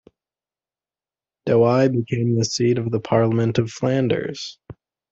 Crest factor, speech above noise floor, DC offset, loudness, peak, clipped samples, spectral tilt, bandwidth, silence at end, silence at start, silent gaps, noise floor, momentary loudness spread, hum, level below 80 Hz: 18 dB; over 71 dB; under 0.1%; -20 LUFS; -4 dBFS; under 0.1%; -6.5 dB/octave; 7.8 kHz; 0.4 s; 1.45 s; none; under -90 dBFS; 11 LU; none; -58 dBFS